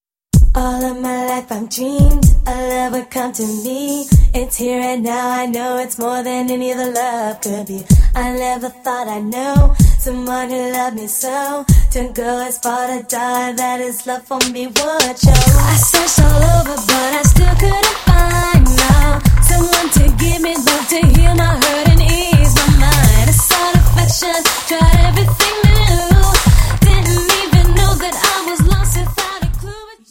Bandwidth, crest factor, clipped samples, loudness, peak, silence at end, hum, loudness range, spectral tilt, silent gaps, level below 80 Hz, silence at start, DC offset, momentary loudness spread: 17 kHz; 12 dB; 0.1%; -14 LUFS; 0 dBFS; 0.2 s; none; 6 LU; -4.5 dB/octave; none; -16 dBFS; 0.35 s; under 0.1%; 10 LU